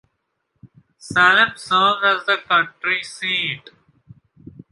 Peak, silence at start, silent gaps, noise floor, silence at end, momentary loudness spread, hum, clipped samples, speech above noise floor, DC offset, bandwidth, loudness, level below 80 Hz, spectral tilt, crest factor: -2 dBFS; 1.05 s; none; -72 dBFS; 1.15 s; 9 LU; none; under 0.1%; 54 dB; under 0.1%; 11.5 kHz; -17 LUFS; -62 dBFS; -2.5 dB/octave; 18 dB